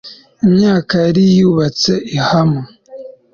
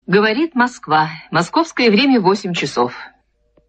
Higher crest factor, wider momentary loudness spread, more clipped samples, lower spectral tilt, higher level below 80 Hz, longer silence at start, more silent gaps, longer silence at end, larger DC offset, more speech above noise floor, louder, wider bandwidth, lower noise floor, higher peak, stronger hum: second, 10 dB vs 16 dB; first, 15 LU vs 7 LU; neither; first, -6.5 dB/octave vs -5 dB/octave; first, -46 dBFS vs -60 dBFS; about the same, 0.05 s vs 0.1 s; neither; second, 0.25 s vs 0.6 s; neither; second, 22 dB vs 43 dB; first, -13 LUFS vs -16 LUFS; second, 7.2 kHz vs 9 kHz; second, -34 dBFS vs -59 dBFS; about the same, -2 dBFS vs -2 dBFS; neither